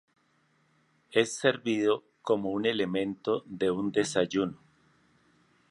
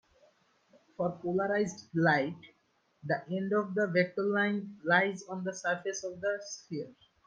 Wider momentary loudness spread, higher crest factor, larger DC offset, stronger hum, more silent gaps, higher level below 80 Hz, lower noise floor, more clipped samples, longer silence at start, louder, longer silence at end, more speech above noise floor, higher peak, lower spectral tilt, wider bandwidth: second, 5 LU vs 13 LU; about the same, 22 dB vs 22 dB; neither; neither; neither; first, -68 dBFS vs -76 dBFS; about the same, -69 dBFS vs -72 dBFS; neither; about the same, 1.1 s vs 1 s; first, -29 LUFS vs -32 LUFS; first, 1.15 s vs 0.35 s; about the same, 41 dB vs 40 dB; first, -8 dBFS vs -12 dBFS; about the same, -4.5 dB/octave vs -5.5 dB/octave; first, 11.5 kHz vs 9.6 kHz